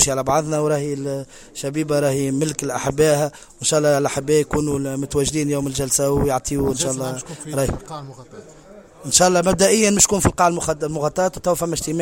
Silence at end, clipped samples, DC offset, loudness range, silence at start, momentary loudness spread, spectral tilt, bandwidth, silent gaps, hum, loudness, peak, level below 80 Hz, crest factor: 0 s; under 0.1%; under 0.1%; 5 LU; 0 s; 12 LU; -4 dB/octave; 17 kHz; none; none; -19 LUFS; 0 dBFS; -40 dBFS; 20 dB